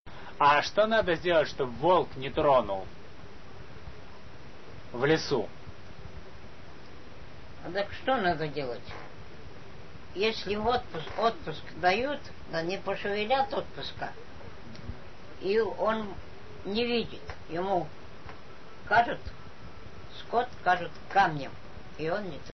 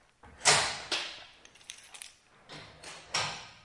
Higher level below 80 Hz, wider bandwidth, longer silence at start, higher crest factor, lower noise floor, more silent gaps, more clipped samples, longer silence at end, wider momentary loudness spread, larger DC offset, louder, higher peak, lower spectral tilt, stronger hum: first, -54 dBFS vs -66 dBFS; second, 6.2 kHz vs 11.5 kHz; second, 0 s vs 0.25 s; second, 20 dB vs 28 dB; second, -49 dBFS vs -55 dBFS; first, 0.00-0.05 s vs none; neither; about the same, 0 s vs 0.1 s; about the same, 23 LU vs 24 LU; first, 1% vs under 0.1%; about the same, -29 LUFS vs -29 LUFS; second, -12 dBFS vs -8 dBFS; first, -3 dB/octave vs 0 dB/octave; neither